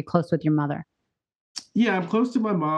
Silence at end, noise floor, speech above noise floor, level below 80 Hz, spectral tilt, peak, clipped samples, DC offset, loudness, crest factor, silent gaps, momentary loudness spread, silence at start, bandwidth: 0 s; -81 dBFS; 58 dB; -66 dBFS; -7 dB/octave; -4 dBFS; under 0.1%; under 0.1%; -24 LUFS; 22 dB; 1.36-1.55 s; 12 LU; 0 s; 10 kHz